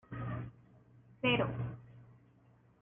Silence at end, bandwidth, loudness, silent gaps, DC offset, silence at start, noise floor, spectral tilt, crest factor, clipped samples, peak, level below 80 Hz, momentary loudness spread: 0.7 s; 3.7 kHz; -36 LUFS; none; under 0.1%; 0.1 s; -66 dBFS; -9 dB/octave; 20 dB; under 0.1%; -20 dBFS; -62 dBFS; 20 LU